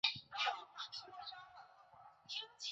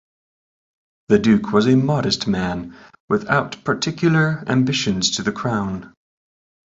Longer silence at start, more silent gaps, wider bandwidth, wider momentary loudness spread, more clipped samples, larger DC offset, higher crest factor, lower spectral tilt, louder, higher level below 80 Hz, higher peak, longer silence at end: second, 0.05 s vs 1.1 s; second, none vs 3.00-3.08 s; about the same, 8 kHz vs 8 kHz; first, 22 LU vs 8 LU; neither; neither; first, 24 dB vs 18 dB; second, 2.5 dB/octave vs -5 dB/octave; second, -44 LUFS vs -19 LUFS; second, -86 dBFS vs -50 dBFS; second, -22 dBFS vs -2 dBFS; second, 0 s vs 0.8 s